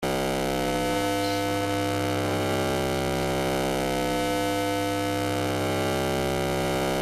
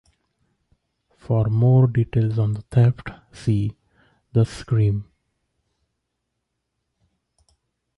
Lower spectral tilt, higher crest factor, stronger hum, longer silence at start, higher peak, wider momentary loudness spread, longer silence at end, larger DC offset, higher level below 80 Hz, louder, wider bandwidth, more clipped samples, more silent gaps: second, -4.5 dB/octave vs -9 dB/octave; about the same, 14 dB vs 16 dB; neither; second, 0 s vs 1.3 s; second, -12 dBFS vs -8 dBFS; second, 1 LU vs 12 LU; second, 0 s vs 2.95 s; neither; about the same, -46 dBFS vs -48 dBFS; second, -26 LUFS vs -21 LUFS; first, 15.5 kHz vs 10.5 kHz; neither; neither